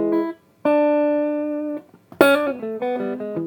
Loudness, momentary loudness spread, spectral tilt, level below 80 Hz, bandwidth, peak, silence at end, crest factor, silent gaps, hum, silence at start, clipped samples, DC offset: -21 LUFS; 11 LU; -5.5 dB/octave; -68 dBFS; over 20 kHz; 0 dBFS; 0 s; 20 dB; none; none; 0 s; under 0.1%; under 0.1%